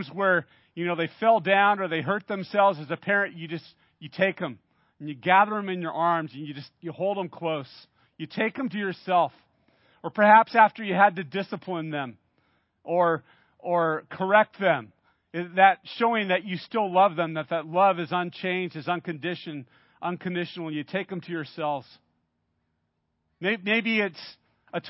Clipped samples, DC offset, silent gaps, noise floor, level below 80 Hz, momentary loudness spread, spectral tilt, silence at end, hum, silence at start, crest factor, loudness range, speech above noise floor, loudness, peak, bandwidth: under 0.1%; under 0.1%; none; -76 dBFS; -78 dBFS; 16 LU; -9.5 dB/octave; 0 s; none; 0 s; 22 dB; 9 LU; 51 dB; -25 LUFS; -4 dBFS; 5.8 kHz